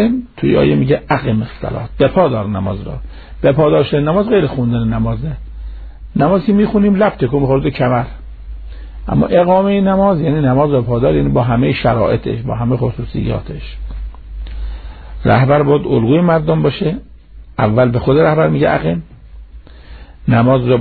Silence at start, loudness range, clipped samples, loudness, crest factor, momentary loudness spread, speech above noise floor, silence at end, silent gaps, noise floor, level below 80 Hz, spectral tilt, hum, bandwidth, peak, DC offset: 0 s; 4 LU; under 0.1%; -14 LUFS; 14 dB; 18 LU; 22 dB; 0 s; none; -35 dBFS; -30 dBFS; -11.5 dB/octave; none; 4.7 kHz; 0 dBFS; under 0.1%